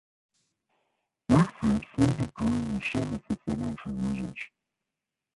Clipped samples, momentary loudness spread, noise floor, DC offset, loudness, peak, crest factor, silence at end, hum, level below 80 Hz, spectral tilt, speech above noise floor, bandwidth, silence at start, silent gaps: under 0.1%; 12 LU; -87 dBFS; under 0.1%; -29 LUFS; -8 dBFS; 22 dB; 0.9 s; none; -48 dBFS; -7 dB/octave; 58 dB; 11.5 kHz; 1.3 s; none